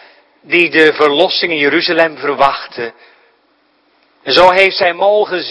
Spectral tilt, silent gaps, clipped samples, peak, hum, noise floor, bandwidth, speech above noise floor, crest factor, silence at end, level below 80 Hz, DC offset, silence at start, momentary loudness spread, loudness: -4.5 dB/octave; none; 0.5%; 0 dBFS; none; -56 dBFS; 11 kHz; 44 dB; 14 dB; 0 s; -50 dBFS; under 0.1%; 0.5 s; 14 LU; -11 LUFS